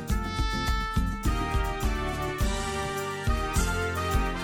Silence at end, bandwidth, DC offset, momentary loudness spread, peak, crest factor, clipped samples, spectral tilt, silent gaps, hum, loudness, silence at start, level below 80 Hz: 0 s; 17.5 kHz; under 0.1%; 3 LU; -14 dBFS; 14 dB; under 0.1%; -5 dB/octave; none; none; -29 LUFS; 0 s; -30 dBFS